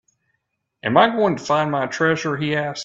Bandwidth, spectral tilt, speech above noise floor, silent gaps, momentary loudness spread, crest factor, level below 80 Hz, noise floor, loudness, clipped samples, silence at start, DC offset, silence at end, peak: 7.8 kHz; -5 dB/octave; 55 dB; none; 6 LU; 20 dB; -60 dBFS; -74 dBFS; -19 LUFS; under 0.1%; 0.85 s; under 0.1%; 0 s; 0 dBFS